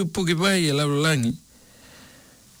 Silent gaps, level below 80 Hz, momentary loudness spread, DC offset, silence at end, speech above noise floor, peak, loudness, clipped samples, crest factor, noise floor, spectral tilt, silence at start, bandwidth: none; -56 dBFS; 7 LU; under 0.1%; 1.25 s; 29 dB; -12 dBFS; -22 LUFS; under 0.1%; 12 dB; -51 dBFS; -4.5 dB/octave; 0 s; 19.5 kHz